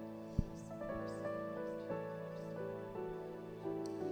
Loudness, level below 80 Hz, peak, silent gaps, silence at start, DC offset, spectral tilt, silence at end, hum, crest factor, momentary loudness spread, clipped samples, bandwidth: -44 LUFS; -56 dBFS; -20 dBFS; none; 0 s; under 0.1%; -7.5 dB/octave; 0 s; none; 24 dB; 4 LU; under 0.1%; over 20 kHz